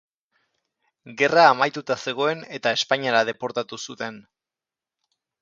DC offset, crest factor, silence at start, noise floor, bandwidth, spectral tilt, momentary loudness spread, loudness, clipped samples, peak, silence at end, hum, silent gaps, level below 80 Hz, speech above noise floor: under 0.1%; 22 dB; 1.05 s; -90 dBFS; 7.6 kHz; -3.5 dB/octave; 17 LU; -21 LUFS; under 0.1%; -2 dBFS; 1.2 s; none; none; -72 dBFS; 68 dB